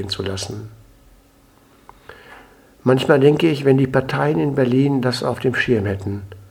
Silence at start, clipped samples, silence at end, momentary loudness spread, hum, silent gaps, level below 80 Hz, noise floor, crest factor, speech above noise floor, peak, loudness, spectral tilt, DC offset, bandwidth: 0 s; under 0.1%; 0.1 s; 13 LU; none; none; -50 dBFS; -52 dBFS; 20 dB; 34 dB; 0 dBFS; -18 LUFS; -6.5 dB/octave; under 0.1%; 16 kHz